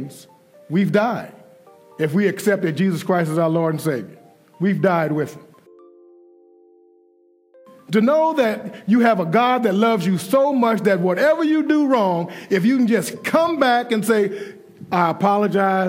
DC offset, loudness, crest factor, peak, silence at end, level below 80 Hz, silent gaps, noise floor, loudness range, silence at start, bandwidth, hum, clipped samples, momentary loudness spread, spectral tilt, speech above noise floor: under 0.1%; -19 LUFS; 16 dB; -4 dBFS; 0 s; -72 dBFS; none; -57 dBFS; 8 LU; 0 s; 16 kHz; none; under 0.1%; 8 LU; -6.5 dB/octave; 39 dB